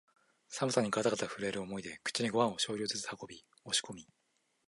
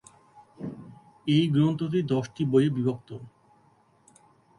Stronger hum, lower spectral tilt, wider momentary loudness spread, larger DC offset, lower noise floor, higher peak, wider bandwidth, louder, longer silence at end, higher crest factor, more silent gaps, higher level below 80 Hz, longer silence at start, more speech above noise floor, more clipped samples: neither; second, -3 dB/octave vs -8 dB/octave; about the same, 16 LU vs 18 LU; neither; first, -78 dBFS vs -62 dBFS; second, -14 dBFS vs -10 dBFS; about the same, 11.5 kHz vs 11 kHz; second, -35 LUFS vs -25 LUFS; second, 0.65 s vs 1.3 s; about the same, 22 dB vs 18 dB; neither; second, -74 dBFS vs -64 dBFS; first, 0.5 s vs 0.35 s; first, 42 dB vs 38 dB; neither